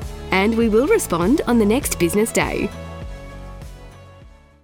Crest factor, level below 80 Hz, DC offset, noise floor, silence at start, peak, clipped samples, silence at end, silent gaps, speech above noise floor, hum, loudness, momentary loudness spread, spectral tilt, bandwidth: 16 dB; -36 dBFS; under 0.1%; -45 dBFS; 0 s; -4 dBFS; under 0.1%; 0.35 s; none; 28 dB; none; -18 LUFS; 20 LU; -5 dB/octave; over 20 kHz